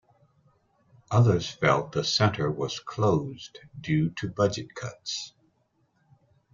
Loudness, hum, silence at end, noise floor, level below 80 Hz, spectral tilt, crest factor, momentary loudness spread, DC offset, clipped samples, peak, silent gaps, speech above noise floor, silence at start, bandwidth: -27 LUFS; none; 1.25 s; -70 dBFS; -60 dBFS; -5.5 dB/octave; 22 dB; 15 LU; under 0.1%; under 0.1%; -6 dBFS; none; 44 dB; 1.1 s; 7.4 kHz